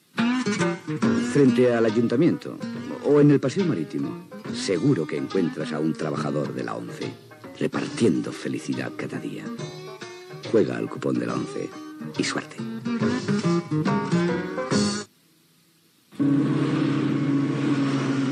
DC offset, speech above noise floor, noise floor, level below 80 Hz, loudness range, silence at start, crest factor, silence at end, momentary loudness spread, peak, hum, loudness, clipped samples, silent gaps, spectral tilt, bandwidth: under 0.1%; 36 dB; -60 dBFS; -70 dBFS; 7 LU; 0.15 s; 16 dB; 0 s; 14 LU; -8 dBFS; none; -24 LUFS; under 0.1%; none; -6.5 dB/octave; 12 kHz